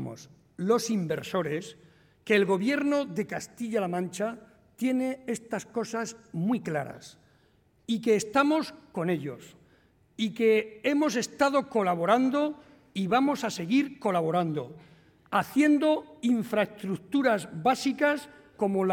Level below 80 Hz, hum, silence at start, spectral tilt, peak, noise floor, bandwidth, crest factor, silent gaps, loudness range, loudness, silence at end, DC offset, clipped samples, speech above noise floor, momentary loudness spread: -70 dBFS; none; 0 s; -5.5 dB/octave; -10 dBFS; -65 dBFS; 17 kHz; 18 dB; none; 5 LU; -28 LUFS; 0 s; under 0.1%; under 0.1%; 37 dB; 12 LU